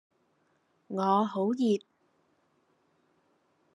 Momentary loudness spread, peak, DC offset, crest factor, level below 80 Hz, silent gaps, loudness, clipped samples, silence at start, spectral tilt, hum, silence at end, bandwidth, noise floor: 6 LU; -12 dBFS; under 0.1%; 20 dB; -88 dBFS; none; -29 LUFS; under 0.1%; 0.9 s; -7 dB/octave; none; 1.95 s; 11 kHz; -72 dBFS